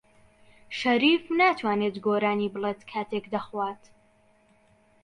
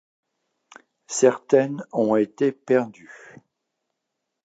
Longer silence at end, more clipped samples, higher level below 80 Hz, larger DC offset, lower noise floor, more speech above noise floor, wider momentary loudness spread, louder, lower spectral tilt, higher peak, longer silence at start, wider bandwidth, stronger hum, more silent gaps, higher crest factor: about the same, 1.3 s vs 1.3 s; neither; about the same, -68 dBFS vs -72 dBFS; neither; second, -62 dBFS vs -81 dBFS; second, 36 dB vs 59 dB; first, 12 LU vs 7 LU; second, -26 LUFS vs -22 LUFS; about the same, -5.5 dB/octave vs -5 dB/octave; second, -10 dBFS vs -2 dBFS; second, 0.7 s vs 1.1 s; first, 10.5 kHz vs 9.2 kHz; neither; neither; about the same, 18 dB vs 22 dB